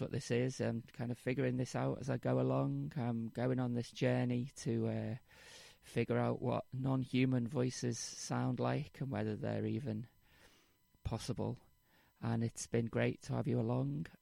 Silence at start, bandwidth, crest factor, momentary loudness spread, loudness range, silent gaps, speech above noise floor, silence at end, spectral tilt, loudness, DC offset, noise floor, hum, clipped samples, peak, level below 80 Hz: 0 s; 12.5 kHz; 18 dB; 9 LU; 5 LU; none; 34 dB; 0.1 s; -6.5 dB/octave; -38 LUFS; under 0.1%; -72 dBFS; none; under 0.1%; -20 dBFS; -64 dBFS